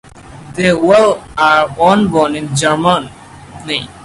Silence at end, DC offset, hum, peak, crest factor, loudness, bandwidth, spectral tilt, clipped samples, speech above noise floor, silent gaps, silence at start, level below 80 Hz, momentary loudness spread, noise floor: 0 s; under 0.1%; none; 0 dBFS; 14 dB; -12 LUFS; 11.5 kHz; -5 dB/octave; under 0.1%; 22 dB; none; 0.15 s; -44 dBFS; 11 LU; -34 dBFS